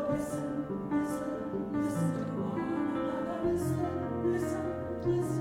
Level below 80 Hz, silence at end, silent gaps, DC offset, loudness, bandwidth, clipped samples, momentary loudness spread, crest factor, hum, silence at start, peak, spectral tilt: -56 dBFS; 0 s; none; under 0.1%; -33 LUFS; 16.5 kHz; under 0.1%; 4 LU; 12 dB; none; 0 s; -20 dBFS; -7.5 dB/octave